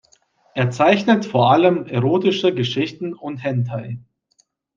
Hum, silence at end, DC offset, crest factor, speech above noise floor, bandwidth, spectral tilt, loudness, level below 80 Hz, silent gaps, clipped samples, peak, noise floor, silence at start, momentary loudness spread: none; 0.75 s; under 0.1%; 18 dB; 45 dB; 7.6 kHz; -7 dB/octave; -18 LUFS; -64 dBFS; none; under 0.1%; -2 dBFS; -63 dBFS; 0.55 s; 15 LU